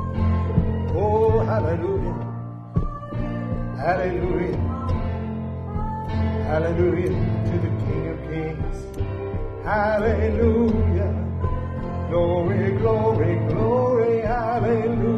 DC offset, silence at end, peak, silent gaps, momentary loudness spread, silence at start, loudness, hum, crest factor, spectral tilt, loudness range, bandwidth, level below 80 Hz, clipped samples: under 0.1%; 0 s; -6 dBFS; none; 9 LU; 0 s; -23 LUFS; none; 16 dB; -9.5 dB/octave; 4 LU; 6.2 kHz; -32 dBFS; under 0.1%